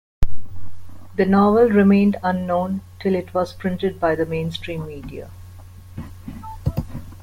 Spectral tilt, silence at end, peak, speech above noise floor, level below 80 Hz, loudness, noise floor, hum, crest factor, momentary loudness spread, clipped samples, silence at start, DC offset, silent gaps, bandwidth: -8 dB/octave; 0.05 s; -4 dBFS; 21 dB; -36 dBFS; -20 LUFS; -40 dBFS; none; 16 dB; 22 LU; under 0.1%; 0.2 s; under 0.1%; none; 15.5 kHz